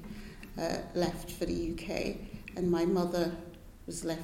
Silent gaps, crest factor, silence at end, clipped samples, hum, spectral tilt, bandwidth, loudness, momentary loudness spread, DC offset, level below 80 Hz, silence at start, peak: none; 18 dB; 0 s; under 0.1%; none; -5.5 dB/octave; 16.5 kHz; -34 LUFS; 16 LU; under 0.1%; -48 dBFS; 0 s; -16 dBFS